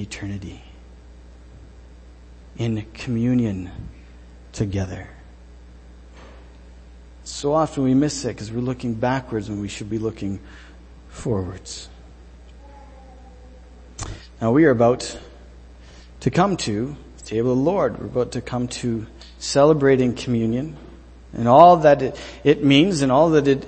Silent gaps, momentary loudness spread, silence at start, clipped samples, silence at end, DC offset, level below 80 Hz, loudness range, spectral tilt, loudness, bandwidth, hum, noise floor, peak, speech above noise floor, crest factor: none; 20 LU; 0 s; under 0.1%; 0 s; under 0.1%; -44 dBFS; 16 LU; -6 dB/octave; -20 LUFS; 8.8 kHz; none; -44 dBFS; 0 dBFS; 24 dB; 22 dB